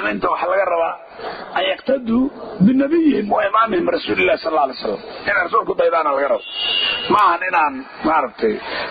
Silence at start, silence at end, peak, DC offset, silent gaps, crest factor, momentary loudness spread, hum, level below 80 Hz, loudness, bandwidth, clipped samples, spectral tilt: 0 s; 0 s; -4 dBFS; under 0.1%; none; 14 dB; 9 LU; none; -52 dBFS; -18 LUFS; 6.2 kHz; under 0.1%; -7 dB/octave